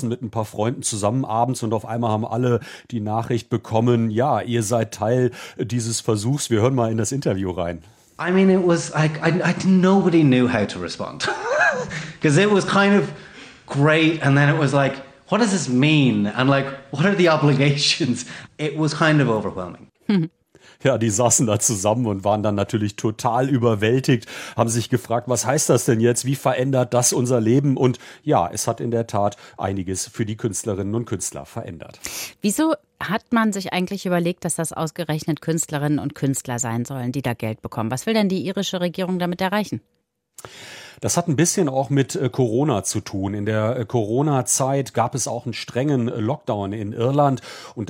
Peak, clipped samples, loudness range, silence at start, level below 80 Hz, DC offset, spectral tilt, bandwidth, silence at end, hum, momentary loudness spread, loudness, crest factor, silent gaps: -2 dBFS; under 0.1%; 6 LU; 0 s; -60 dBFS; under 0.1%; -5 dB/octave; 16.5 kHz; 0.05 s; none; 11 LU; -21 LUFS; 18 dB; none